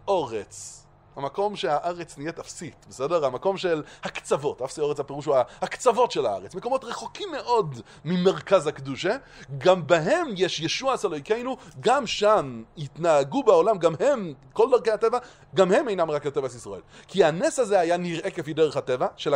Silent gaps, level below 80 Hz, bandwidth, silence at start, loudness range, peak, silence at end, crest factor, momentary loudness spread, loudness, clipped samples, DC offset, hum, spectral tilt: none; -60 dBFS; 11.5 kHz; 0.05 s; 6 LU; -4 dBFS; 0 s; 20 dB; 14 LU; -25 LUFS; under 0.1%; under 0.1%; none; -5 dB/octave